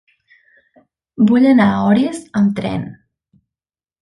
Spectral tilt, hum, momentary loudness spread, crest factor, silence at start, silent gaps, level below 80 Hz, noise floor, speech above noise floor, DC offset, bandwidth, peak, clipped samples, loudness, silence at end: -7.5 dB/octave; none; 13 LU; 16 dB; 1.2 s; none; -52 dBFS; under -90 dBFS; over 76 dB; under 0.1%; 11.5 kHz; 0 dBFS; under 0.1%; -15 LUFS; 1.1 s